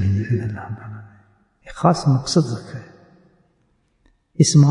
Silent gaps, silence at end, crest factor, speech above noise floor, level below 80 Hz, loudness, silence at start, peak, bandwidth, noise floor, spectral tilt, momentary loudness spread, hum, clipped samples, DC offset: none; 0 s; 18 dB; 46 dB; -52 dBFS; -19 LUFS; 0 s; -2 dBFS; 11 kHz; -64 dBFS; -6 dB/octave; 22 LU; none; under 0.1%; under 0.1%